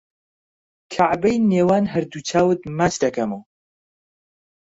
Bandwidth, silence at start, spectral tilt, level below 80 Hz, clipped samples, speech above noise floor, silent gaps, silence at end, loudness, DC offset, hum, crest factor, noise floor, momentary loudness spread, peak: 8 kHz; 0.9 s; -6 dB/octave; -54 dBFS; under 0.1%; over 71 dB; none; 1.3 s; -20 LUFS; under 0.1%; none; 16 dB; under -90 dBFS; 9 LU; -6 dBFS